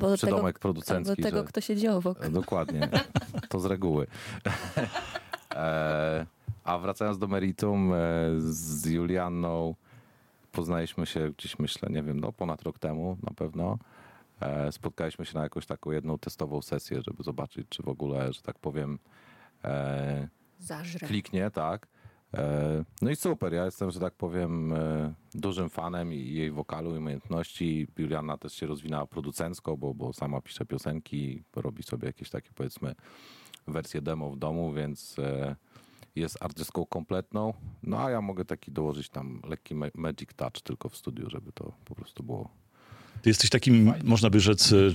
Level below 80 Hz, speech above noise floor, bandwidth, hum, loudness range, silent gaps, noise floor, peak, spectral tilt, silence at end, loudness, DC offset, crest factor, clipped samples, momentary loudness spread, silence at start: -56 dBFS; 32 dB; 16.5 kHz; none; 7 LU; none; -62 dBFS; -8 dBFS; -5.5 dB/octave; 0 s; -31 LUFS; under 0.1%; 24 dB; under 0.1%; 12 LU; 0 s